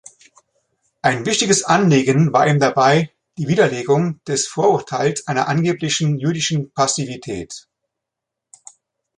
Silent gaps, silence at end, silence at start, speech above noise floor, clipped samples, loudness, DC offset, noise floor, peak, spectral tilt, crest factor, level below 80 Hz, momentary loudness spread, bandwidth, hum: none; 1.6 s; 1.05 s; 66 dB; under 0.1%; -17 LUFS; under 0.1%; -83 dBFS; -2 dBFS; -4.5 dB/octave; 16 dB; -56 dBFS; 12 LU; 11.5 kHz; none